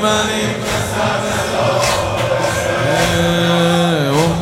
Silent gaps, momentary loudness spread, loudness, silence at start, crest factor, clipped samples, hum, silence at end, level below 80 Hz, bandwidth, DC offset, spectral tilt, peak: none; 4 LU; -15 LUFS; 0 s; 14 dB; under 0.1%; none; 0 s; -36 dBFS; 16.5 kHz; under 0.1%; -4.5 dB/octave; -2 dBFS